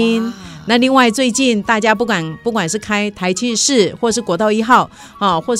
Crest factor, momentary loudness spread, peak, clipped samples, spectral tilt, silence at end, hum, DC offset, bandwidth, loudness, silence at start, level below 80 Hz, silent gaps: 14 dB; 7 LU; 0 dBFS; under 0.1%; -3.5 dB/octave; 0 s; none; under 0.1%; 14.5 kHz; -15 LUFS; 0 s; -50 dBFS; none